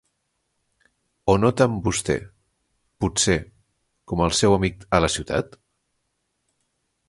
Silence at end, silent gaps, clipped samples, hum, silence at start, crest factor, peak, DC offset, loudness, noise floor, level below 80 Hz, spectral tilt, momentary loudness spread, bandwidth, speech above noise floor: 1.65 s; none; under 0.1%; none; 1.25 s; 22 dB; -2 dBFS; under 0.1%; -22 LUFS; -74 dBFS; -42 dBFS; -4.5 dB/octave; 9 LU; 11.5 kHz; 54 dB